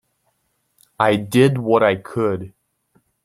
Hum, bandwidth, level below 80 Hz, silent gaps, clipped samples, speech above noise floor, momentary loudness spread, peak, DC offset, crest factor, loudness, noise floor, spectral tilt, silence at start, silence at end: none; 15.5 kHz; -60 dBFS; none; under 0.1%; 51 dB; 9 LU; -2 dBFS; under 0.1%; 18 dB; -18 LUFS; -68 dBFS; -6.5 dB/octave; 1 s; 0.75 s